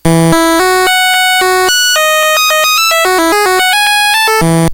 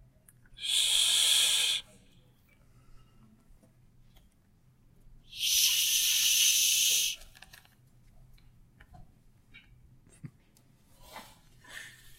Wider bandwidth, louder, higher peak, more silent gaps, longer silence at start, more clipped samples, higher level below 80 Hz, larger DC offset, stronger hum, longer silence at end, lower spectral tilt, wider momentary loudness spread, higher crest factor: first, over 20 kHz vs 16 kHz; first, -8 LUFS vs -24 LUFS; first, 0 dBFS vs -12 dBFS; neither; second, 0.05 s vs 0.6 s; first, 3% vs under 0.1%; first, -36 dBFS vs -62 dBFS; neither; neither; second, 0 s vs 0.3 s; first, -3 dB/octave vs 3 dB/octave; second, 1 LU vs 24 LU; second, 8 dB vs 22 dB